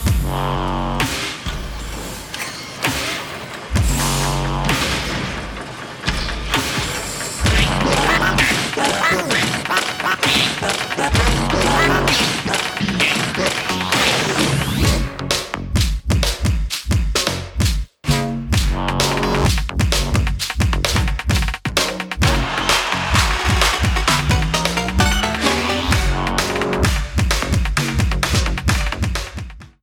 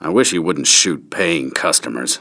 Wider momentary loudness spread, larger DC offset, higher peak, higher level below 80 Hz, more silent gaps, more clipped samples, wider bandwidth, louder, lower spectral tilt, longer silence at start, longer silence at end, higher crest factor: about the same, 8 LU vs 7 LU; neither; about the same, 0 dBFS vs 0 dBFS; first, -24 dBFS vs -58 dBFS; neither; neither; first, 19 kHz vs 11 kHz; second, -18 LUFS vs -15 LUFS; first, -3.5 dB/octave vs -1.5 dB/octave; about the same, 0 s vs 0 s; first, 0.15 s vs 0 s; about the same, 18 dB vs 16 dB